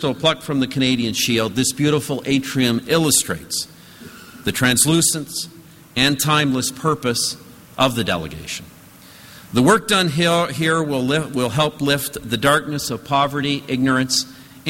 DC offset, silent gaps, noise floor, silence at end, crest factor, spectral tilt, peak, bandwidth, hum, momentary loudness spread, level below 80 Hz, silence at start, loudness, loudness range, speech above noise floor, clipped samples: under 0.1%; none; -44 dBFS; 0 s; 18 dB; -3.5 dB/octave; -2 dBFS; 16.5 kHz; none; 12 LU; -50 dBFS; 0 s; -18 LUFS; 2 LU; 25 dB; under 0.1%